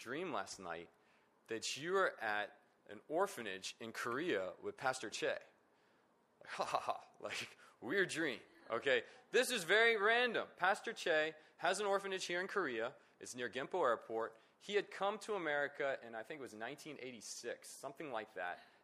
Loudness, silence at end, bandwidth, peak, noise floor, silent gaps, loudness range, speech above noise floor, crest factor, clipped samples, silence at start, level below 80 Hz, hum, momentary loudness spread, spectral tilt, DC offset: -40 LUFS; 0.2 s; 15 kHz; -20 dBFS; -74 dBFS; none; 8 LU; 34 dB; 22 dB; under 0.1%; 0 s; -88 dBFS; none; 13 LU; -2.5 dB/octave; under 0.1%